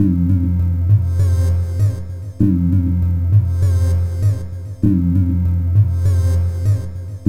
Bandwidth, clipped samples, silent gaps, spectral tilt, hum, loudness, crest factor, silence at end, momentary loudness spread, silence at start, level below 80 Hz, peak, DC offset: 9.4 kHz; under 0.1%; none; -9.5 dB/octave; none; -17 LUFS; 12 dB; 0 s; 5 LU; 0 s; -34 dBFS; -4 dBFS; under 0.1%